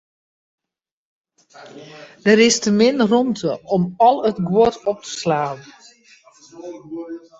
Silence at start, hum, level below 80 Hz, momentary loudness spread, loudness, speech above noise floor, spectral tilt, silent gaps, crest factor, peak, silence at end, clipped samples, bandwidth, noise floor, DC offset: 1.6 s; none; -58 dBFS; 22 LU; -17 LUFS; 32 dB; -4.5 dB/octave; none; 20 dB; 0 dBFS; 0.2 s; under 0.1%; 8.2 kHz; -51 dBFS; under 0.1%